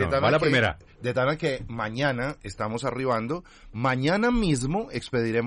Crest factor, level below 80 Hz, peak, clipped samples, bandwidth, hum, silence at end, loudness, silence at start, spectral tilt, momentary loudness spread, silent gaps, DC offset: 14 dB; -44 dBFS; -12 dBFS; under 0.1%; 11.5 kHz; none; 0 s; -26 LUFS; 0 s; -6 dB/octave; 11 LU; none; under 0.1%